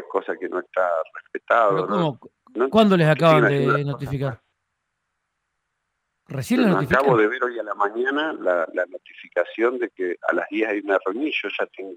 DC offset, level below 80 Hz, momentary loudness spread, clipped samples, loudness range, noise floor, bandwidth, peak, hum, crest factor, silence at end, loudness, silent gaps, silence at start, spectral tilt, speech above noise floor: under 0.1%; -58 dBFS; 12 LU; under 0.1%; 5 LU; -77 dBFS; 16 kHz; -4 dBFS; none; 18 dB; 0 s; -21 LUFS; none; 0 s; -7 dB/octave; 56 dB